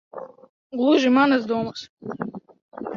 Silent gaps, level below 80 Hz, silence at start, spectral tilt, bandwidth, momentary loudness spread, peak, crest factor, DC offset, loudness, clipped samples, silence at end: 0.49-0.70 s, 1.89-1.97 s, 2.62-2.69 s; -66 dBFS; 0.15 s; -5.5 dB/octave; 7.2 kHz; 22 LU; -6 dBFS; 16 dB; under 0.1%; -21 LUFS; under 0.1%; 0 s